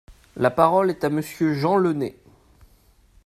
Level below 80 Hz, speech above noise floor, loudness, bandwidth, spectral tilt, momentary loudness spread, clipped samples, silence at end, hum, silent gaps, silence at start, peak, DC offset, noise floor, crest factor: -56 dBFS; 36 dB; -21 LUFS; 14.5 kHz; -7 dB/octave; 10 LU; under 0.1%; 1.15 s; none; none; 0.1 s; 0 dBFS; under 0.1%; -57 dBFS; 22 dB